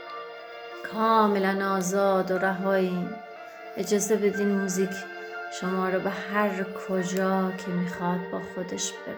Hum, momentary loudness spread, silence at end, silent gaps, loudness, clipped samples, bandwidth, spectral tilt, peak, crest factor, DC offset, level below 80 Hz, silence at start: none; 15 LU; 0 s; none; -27 LUFS; under 0.1%; over 20 kHz; -5 dB/octave; -8 dBFS; 18 dB; under 0.1%; -70 dBFS; 0 s